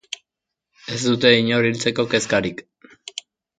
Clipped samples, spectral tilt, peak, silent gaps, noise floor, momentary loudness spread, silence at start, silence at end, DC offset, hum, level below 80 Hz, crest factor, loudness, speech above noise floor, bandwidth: under 0.1%; -4 dB/octave; 0 dBFS; none; -84 dBFS; 21 LU; 0.1 s; 1 s; under 0.1%; none; -58 dBFS; 22 dB; -19 LUFS; 65 dB; 9.4 kHz